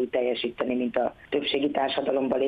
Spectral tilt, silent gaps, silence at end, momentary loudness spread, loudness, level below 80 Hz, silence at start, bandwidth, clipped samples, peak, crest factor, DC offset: -7 dB/octave; none; 0 s; 3 LU; -27 LUFS; -62 dBFS; 0 s; 5 kHz; under 0.1%; -10 dBFS; 16 dB; under 0.1%